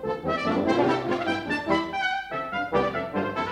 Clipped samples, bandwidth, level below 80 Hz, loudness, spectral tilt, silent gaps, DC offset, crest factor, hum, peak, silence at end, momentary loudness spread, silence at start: under 0.1%; 12 kHz; -56 dBFS; -26 LUFS; -6 dB/octave; none; under 0.1%; 16 dB; none; -10 dBFS; 0 s; 6 LU; 0 s